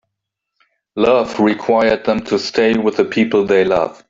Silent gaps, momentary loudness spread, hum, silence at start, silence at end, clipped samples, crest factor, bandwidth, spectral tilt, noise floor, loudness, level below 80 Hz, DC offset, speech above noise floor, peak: none; 4 LU; none; 0.95 s; 0.15 s; under 0.1%; 14 dB; 7.8 kHz; -5.5 dB/octave; -78 dBFS; -15 LUFS; -50 dBFS; under 0.1%; 63 dB; -2 dBFS